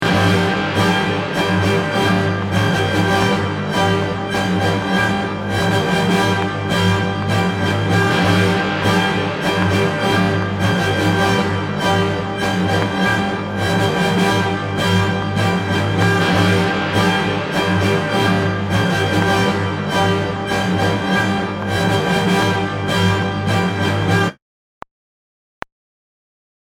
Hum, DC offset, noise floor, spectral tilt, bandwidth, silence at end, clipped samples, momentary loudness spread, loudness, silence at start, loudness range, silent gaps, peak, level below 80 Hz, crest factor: none; under 0.1%; under -90 dBFS; -5.5 dB/octave; 16 kHz; 2.45 s; under 0.1%; 4 LU; -17 LUFS; 0 s; 1 LU; none; 0 dBFS; -44 dBFS; 16 dB